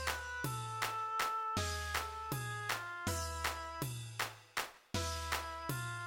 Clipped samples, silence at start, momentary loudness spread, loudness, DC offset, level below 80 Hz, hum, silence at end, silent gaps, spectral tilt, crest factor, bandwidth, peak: under 0.1%; 0 s; 5 LU; -39 LUFS; under 0.1%; -54 dBFS; none; 0 s; none; -3 dB/octave; 18 dB; 17 kHz; -22 dBFS